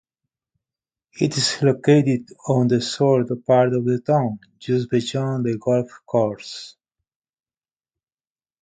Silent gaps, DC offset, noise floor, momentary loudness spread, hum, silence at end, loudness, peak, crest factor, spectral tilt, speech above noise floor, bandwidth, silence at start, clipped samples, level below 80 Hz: none; under 0.1%; under -90 dBFS; 9 LU; none; 1.95 s; -20 LUFS; -2 dBFS; 20 dB; -6 dB/octave; over 70 dB; 9.4 kHz; 1.15 s; under 0.1%; -62 dBFS